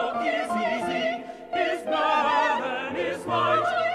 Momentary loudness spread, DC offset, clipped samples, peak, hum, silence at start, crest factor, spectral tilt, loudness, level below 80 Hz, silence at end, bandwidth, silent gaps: 7 LU; under 0.1%; under 0.1%; -12 dBFS; none; 0 s; 14 dB; -4.5 dB/octave; -25 LUFS; -64 dBFS; 0 s; 13 kHz; none